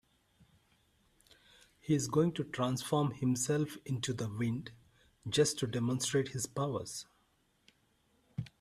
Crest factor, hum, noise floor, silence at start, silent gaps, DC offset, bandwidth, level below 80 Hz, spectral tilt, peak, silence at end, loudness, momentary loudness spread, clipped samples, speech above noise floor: 20 dB; none; -74 dBFS; 1.85 s; none; under 0.1%; 15 kHz; -68 dBFS; -5 dB/octave; -16 dBFS; 0.15 s; -34 LUFS; 14 LU; under 0.1%; 40 dB